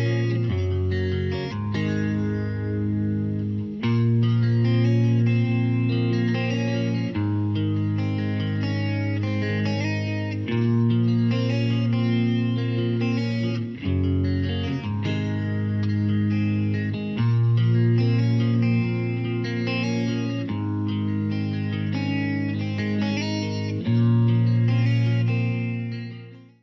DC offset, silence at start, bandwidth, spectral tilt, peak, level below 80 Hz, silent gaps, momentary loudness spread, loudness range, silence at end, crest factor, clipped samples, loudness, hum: under 0.1%; 0 s; 6.2 kHz; -8.5 dB/octave; -12 dBFS; -52 dBFS; none; 7 LU; 4 LU; 0.2 s; 10 dB; under 0.1%; -24 LUFS; none